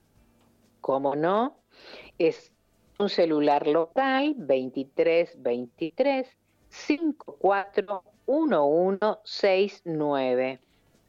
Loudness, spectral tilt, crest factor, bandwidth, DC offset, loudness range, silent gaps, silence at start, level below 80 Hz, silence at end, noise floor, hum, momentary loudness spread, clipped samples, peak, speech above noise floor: -26 LUFS; -6 dB/octave; 16 dB; 7.4 kHz; under 0.1%; 3 LU; none; 0.85 s; -72 dBFS; 0.5 s; -63 dBFS; none; 11 LU; under 0.1%; -10 dBFS; 37 dB